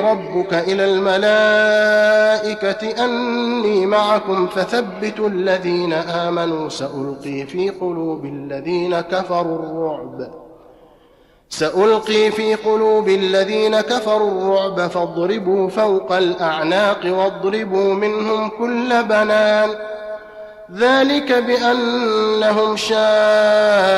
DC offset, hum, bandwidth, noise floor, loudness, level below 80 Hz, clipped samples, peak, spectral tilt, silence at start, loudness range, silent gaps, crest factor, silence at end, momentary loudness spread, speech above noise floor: under 0.1%; none; 12.5 kHz; -51 dBFS; -17 LUFS; -58 dBFS; under 0.1%; -4 dBFS; -4.5 dB/octave; 0 s; 7 LU; none; 12 dB; 0 s; 11 LU; 35 dB